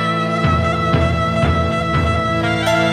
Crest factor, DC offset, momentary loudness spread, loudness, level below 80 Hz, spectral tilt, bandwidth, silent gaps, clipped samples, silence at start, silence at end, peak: 14 dB; under 0.1%; 1 LU; -17 LUFS; -28 dBFS; -6.5 dB/octave; 13 kHz; none; under 0.1%; 0 s; 0 s; -2 dBFS